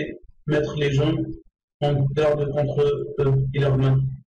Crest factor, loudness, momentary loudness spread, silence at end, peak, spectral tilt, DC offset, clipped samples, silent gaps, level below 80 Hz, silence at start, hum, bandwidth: 8 dB; -22 LUFS; 9 LU; 0.05 s; -14 dBFS; -8 dB/octave; under 0.1%; under 0.1%; 1.63-1.68 s, 1.74-1.80 s; -42 dBFS; 0 s; none; 7.2 kHz